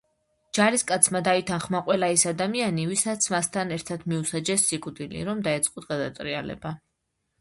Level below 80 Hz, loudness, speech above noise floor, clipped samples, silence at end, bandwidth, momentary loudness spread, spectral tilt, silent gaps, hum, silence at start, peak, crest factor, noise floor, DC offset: -60 dBFS; -25 LUFS; 52 dB; under 0.1%; 0.65 s; 12 kHz; 11 LU; -3.5 dB/octave; none; none; 0.55 s; -2 dBFS; 24 dB; -78 dBFS; under 0.1%